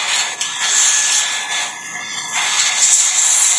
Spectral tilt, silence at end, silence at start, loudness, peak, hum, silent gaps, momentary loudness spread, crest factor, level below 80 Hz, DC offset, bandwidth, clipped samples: 3.5 dB/octave; 0 s; 0 s; -13 LUFS; 0 dBFS; none; none; 12 LU; 16 dB; -78 dBFS; under 0.1%; 11 kHz; under 0.1%